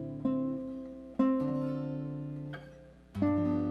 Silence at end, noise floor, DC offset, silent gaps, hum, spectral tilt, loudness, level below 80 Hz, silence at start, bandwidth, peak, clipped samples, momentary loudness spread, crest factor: 0 s; -53 dBFS; under 0.1%; none; none; -10 dB/octave; -34 LUFS; -60 dBFS; 0 s; 5.6 kHz; -16 dBFS; under 0.1%; 15 LU; 16 dB